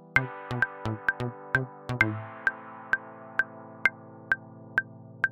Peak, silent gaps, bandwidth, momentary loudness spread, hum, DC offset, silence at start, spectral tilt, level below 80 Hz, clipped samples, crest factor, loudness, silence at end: -6 dBFS; none; 15 kHz; 9 LU; none; under 0.1%; 0.05 s; -6 dB/octave; -58 dBFS; under 0.1%; 26 dB; -30 LUFS; 0 s